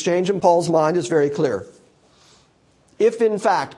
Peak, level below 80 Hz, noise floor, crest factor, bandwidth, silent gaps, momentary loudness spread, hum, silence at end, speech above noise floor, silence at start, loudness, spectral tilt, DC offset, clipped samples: -4 dBFS; -66 dBFS; -58 dBFS; 18 dB; 11.5 kHz; none; 5 LU; none; 0.05 s; 39 dB; 0 s; -19 LUFS; -5.5 dB/octave; under 0.1%; under 0.1%